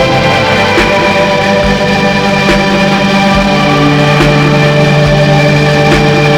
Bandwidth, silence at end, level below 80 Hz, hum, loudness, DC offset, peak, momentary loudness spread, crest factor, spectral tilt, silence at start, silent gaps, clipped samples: 14 kHz; 0 s; -26 dBFS; none; -7 LUFS; under 0.1%; 0 dBFS; 2 LU; 8 dB; -5.5 dB/octave; 0 s; none; 1%